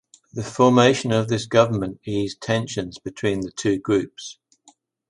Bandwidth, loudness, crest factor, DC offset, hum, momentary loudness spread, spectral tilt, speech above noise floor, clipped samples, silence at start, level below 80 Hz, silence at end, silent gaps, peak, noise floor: 11.5 kHz; -21 LUFS; 20 dB; under 0.1%; none; 16 LU; -5.5 dB/octave; 37 dB; under 0.1%; 0.35 s; -54 dBFS; 0.75 s; none; -2 dBFS; -58 dBFS